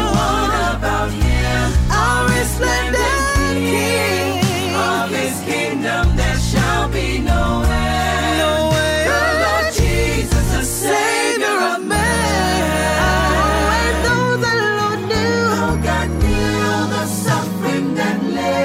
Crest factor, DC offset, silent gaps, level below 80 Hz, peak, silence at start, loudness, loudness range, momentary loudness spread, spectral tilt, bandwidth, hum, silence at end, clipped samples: 10 dB; under 0.1%; none; -24 dBFS; -6 dBFS; 0 s; -17 LUFS; 2 LU; 3 LU; -4.5 dB/octave; 16 kHz; none; 0 s; under 0.1%